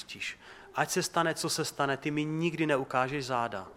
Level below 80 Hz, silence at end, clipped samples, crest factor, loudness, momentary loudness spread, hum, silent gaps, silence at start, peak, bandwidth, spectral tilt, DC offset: -68 dBFS; 0 s; under 0.1%; 22 dB; -31 LUFS; 9 LU; none; none; 0 s; -10 dBFS; 16.5 kHz; -4 dB/octave; under 0.1%